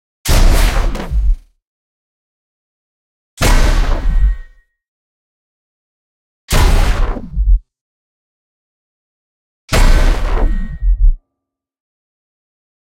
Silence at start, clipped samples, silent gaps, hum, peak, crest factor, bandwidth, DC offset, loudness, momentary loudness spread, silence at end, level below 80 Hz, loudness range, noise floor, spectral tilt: 0.25 s; under 0.1%; 1.67-3.37 s, 4.88-6.48 s, 7.81-9.68 s; none; 0 dBFS; 14 dB; 16 kHz; under 0.1%; -17 LUFS; 8 LU; 1.65 s; -16 dBFS; 2 LU; -79 dBFS; -4.5 dB/octave